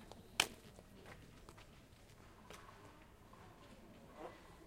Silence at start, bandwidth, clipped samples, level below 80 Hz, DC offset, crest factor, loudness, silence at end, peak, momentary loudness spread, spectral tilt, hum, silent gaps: 0 s; 16 kHz; under 0.1%; -68 dBFS; under 0.1%; 40 dB; -44 LUFS; 0 s; -10 dBFS; 24 LU; -1.5 dB/octave; none; none